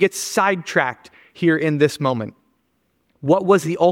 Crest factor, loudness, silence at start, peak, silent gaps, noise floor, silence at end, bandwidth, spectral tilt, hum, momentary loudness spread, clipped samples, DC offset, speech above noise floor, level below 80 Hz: 18 dB; -19 LUFS; 0 s; -2 dBFS; none; -67 dBFS; 0 s; 17 kHz; -5 dB/octave; none; 12 LU; under 0.1%; under 0.1%; 49 dB; -66 dBFS